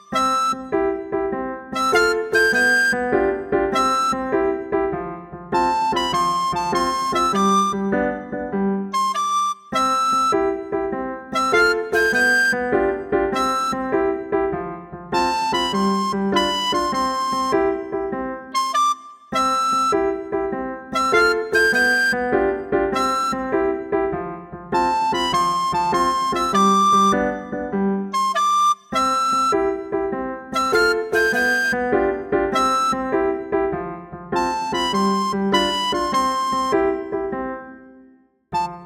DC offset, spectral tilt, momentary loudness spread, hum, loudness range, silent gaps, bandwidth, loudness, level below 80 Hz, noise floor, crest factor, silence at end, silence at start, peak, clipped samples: under 0.1%; -4 dB/octave; 9 LU; none; 3 LU; none; 16.5 kHz; -20 LUFS; -48 dBFS; -53 dBFS; 16 dB; 0 s; 0.1 s; -4 dBFS; under 0.1%